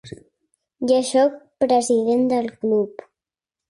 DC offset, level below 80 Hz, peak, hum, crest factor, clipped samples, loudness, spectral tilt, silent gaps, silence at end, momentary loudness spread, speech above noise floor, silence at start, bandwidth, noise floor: under 0.1%; -64 dBFS; -6 dBFS; none; 16 dB; under 0.1%; -20 LUFS; -4.5 dB/octave; none; 0.8 s; 7 LU; 69 dB; 0.05 s; 11.5 kHz; -88 dBFS